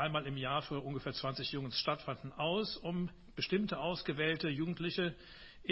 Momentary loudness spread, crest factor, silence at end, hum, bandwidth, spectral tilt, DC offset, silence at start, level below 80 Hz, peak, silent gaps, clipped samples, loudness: 6 LU; 20 dB; 0 s; none; 7.4 kHz; -8 dB/octave; under 0.1%; 0 s; -62 dBFS; -18 dBFS; none; under 0.1%; -37 LUFS